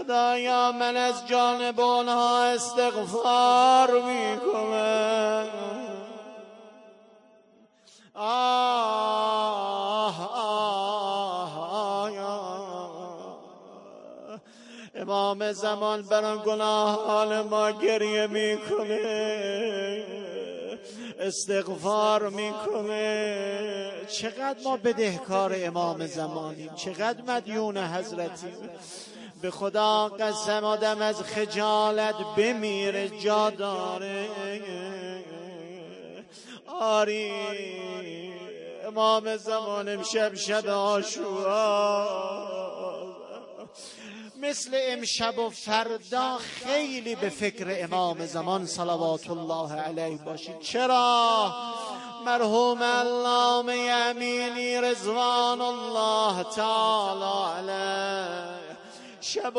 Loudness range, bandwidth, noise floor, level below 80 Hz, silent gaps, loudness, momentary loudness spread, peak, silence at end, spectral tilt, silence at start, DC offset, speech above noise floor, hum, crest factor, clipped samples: 8 LU; 11 kHz; -59 dBFS; -78 dBFS; none; -27 LUFS; 17 LU; -8 dBFS; 0 s; -3 dB/octave; 0 s; under 0.1%; 33 dB; none; 20 dB; under 0.1%